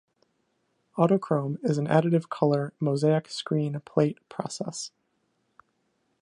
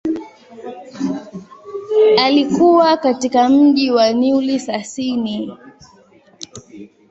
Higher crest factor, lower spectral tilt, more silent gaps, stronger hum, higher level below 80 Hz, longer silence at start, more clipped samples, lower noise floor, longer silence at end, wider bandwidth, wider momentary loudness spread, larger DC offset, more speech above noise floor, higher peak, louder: first, 22 dB vs 16 dB; first, -6.5 dB/octave vs -4.5 dB/octave; neither; neither; second, -74 dBFS vs -58 dBFS; first, 0.95 s vs 0.05 s; neither; first, -73 dBFS vs -49 dBFS; first, 1.35 s vs 0.25 s; first, 11 kHz vs 8 kHz; second, 12 LU vs 23 LU; neither; first, 48 dB vs 35 dB; second, -6 dBFS vs 0 dBFS; second, -26 LUFS vs -15 LUFS